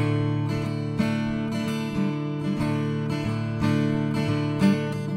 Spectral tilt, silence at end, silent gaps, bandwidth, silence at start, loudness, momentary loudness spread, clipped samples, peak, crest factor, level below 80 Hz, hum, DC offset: -7.5 dB/octave; 0 s; none; 13 kHz; 0 s; -26 LUFS; 5 LU; under 0.1%; -10 dBFS; 14 dB; -50 dBFS; none; under 0.1%